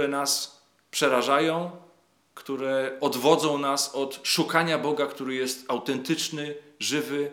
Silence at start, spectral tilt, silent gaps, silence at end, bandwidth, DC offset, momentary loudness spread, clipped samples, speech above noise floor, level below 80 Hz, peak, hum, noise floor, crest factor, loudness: 0 s; -3 dB/octave; none; 0 s; 18.5 kHz; under 0.1%; 10 LU; under 0.1%; 36 dB; under -90 dBFS; -4 dBFS; none; -62 dBFS; 22 dB; -26 LUFS